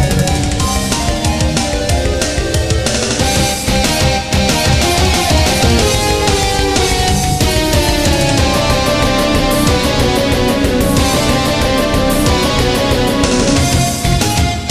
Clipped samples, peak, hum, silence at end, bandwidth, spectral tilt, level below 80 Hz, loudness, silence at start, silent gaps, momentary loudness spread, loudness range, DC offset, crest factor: under 0.1%; 0 dBFS; none; 0 s; 15.5 kHz; -4 dB/octave; -20 dBFS; -13 LUFS; 0 s; none; 3 LU; 2 LU; under 0.1%; 12 dB